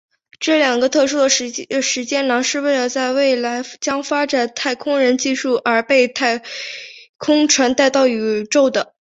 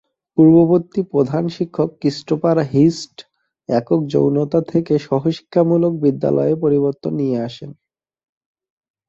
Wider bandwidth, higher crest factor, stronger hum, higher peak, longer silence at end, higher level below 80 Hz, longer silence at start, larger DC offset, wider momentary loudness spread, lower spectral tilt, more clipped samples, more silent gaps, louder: about the same, 8 kHz vs 7.8 kHz; about the same, 16 dB vs 16 dB; neither; about the same, -2 dBFS vs -2 dBFS; second, 0.35 s vs 1.35 s; second, -64 dBFS vs -56 dBFS; about the same, 0.4 s vs 0.35 s; neither; about the same, 9 LU vs 10 LU; second, -1.5 dB/octave vs -8.5 dB/octave; neither; first, 7.09-7.14 s vs none; about the same, -17 LUFS vs -17 LUFS